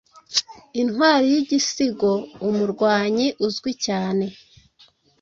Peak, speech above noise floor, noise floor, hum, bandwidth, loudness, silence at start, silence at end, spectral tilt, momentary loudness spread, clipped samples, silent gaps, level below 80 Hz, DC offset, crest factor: -4 dBFS; 36 dB; -56 dBFS; none; 7.8 kHz; -21 LUFS; 0.3 s; 0.9 s; -4 dB/octave; 8 LU; under 0.1%; none; -62 dBFS; under 0.1%; 18 dB